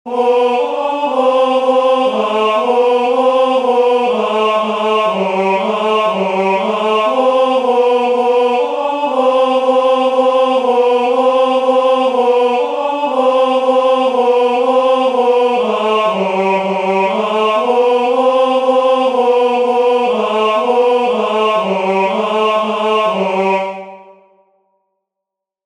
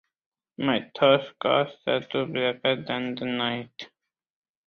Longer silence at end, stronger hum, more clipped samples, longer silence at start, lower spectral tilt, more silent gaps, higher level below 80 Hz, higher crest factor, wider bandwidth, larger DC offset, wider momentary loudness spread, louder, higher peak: first, 1.65 s vs 0.8 s; neither; neither; second, 0.05 s vs 0.6 s; second, -5 dB/octave vs -7 dB/octave; neither; about the same, -64 dBFS vs -68 dBFS; second, 12 dB vs 22 dB; first, 10.5 kHz vs 6.4 kHz; neither; second, 3 LU vs 11 LU; first, -13 LUFS vs -26 LUFS; first, 0 dBFS vs -6 dBFS